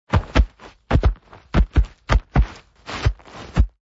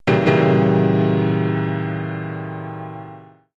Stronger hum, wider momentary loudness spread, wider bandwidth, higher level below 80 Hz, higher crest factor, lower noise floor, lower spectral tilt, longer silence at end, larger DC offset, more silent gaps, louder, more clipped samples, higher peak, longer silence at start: neither; second, 12 LU vs 17 LU; about the same, 7.6 kHz vs 7.2 kHz; first, -22 dBFS vs -54 dBFS; about the same, 16 dB vs 16 dB; second, -37 dBFS vs -41 dBFS; second, -7 dB/octave vs -9 dB/octave; second, 0.15 s vs 0.35 s; neither; neither; second, -22 LUFS vs -18 LUFS; neither; about the same, -6 dBFS vs -4 dBFS; about the same, 0.1 s vs 0.05 s